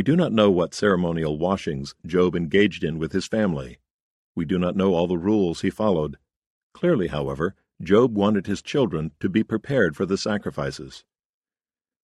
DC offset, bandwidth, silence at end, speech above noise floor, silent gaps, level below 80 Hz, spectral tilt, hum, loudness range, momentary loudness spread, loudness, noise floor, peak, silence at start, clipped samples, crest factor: under 0.1%; 11.5 kHz; 1.05 s; over 68 dB; 3.91-4.35 s, 6.36-6.70 s; -50 dBFS; -6.5 dB/octave; none; 2 LU; 11 LU; -23 LUFS; under -90 dBFS; -4 dBFS; 0 s; under 0.1%; 18 dB